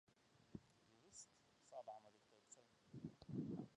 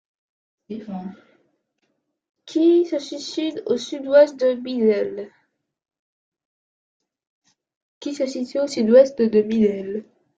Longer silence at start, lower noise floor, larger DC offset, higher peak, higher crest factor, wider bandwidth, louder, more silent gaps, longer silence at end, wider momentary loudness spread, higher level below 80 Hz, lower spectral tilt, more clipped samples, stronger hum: second, 0.1 s vs 0.7 s; about the same, -74 dBFS vs -73 dBFS; neither; second, -36 dBFS vs -2 dBFS; about the same, 22 dB vs 20 dB; first, 11 kHz vs 9 kHz; second, -58 LUFS vs -20 LUFS; second, none vs 2.29-2.34 s, 5.99-6.32 s, 6.45-7.00 s, 7.27-7.42 s, 7.76-8.01 s; second, 0 s vs 0.35 s; second, 16 LU vs 19 LU; second, -82 dBFS vs -68 dBFS; about the same, -6 dB/octave vs -5.5 dB/octave; neither; neither